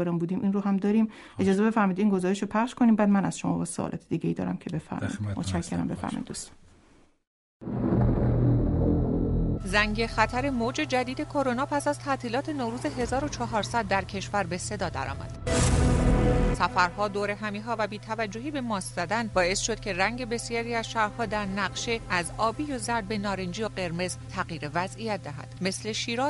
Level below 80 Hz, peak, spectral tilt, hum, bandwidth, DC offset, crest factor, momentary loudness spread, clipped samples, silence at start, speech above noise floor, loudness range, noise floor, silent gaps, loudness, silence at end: -38 dBFS; -6 dBFS; -5.5 dB/octave; none; 11.5 kHz; under 0.1%; 20 dB; 8 LU; under 0.1%; 0 s; 31 dB; 6 LU; -59 dBFS; 7.27-7.60 s; -28 LUFS; 0 s